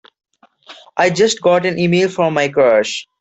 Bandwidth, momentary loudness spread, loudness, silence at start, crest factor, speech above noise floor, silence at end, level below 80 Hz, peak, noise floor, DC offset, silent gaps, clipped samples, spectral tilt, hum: 8.2 kHz; 4 LU; -14 LUFS; 0.7 s; 14 dB; 29 dB; 0.2 s; -58 dBFS; -2 dBFS; -43 dBFS; under 0.1%; none; under 0.1%; -4.5 dB/octave; none